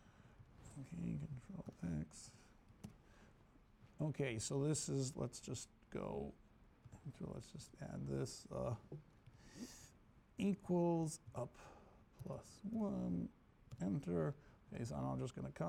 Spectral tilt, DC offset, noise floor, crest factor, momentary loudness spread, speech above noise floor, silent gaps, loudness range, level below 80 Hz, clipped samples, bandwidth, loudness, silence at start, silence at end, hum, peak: -6 dB/octave; under 0.1%; -68 dBFS; 18 dB; 20 LU; 24 dB; none; 6 LU; -66 dBFS; under 0.1%; 15.5 kHz; -45 LUFS; 0 s; 0 s; none; -28 dBFS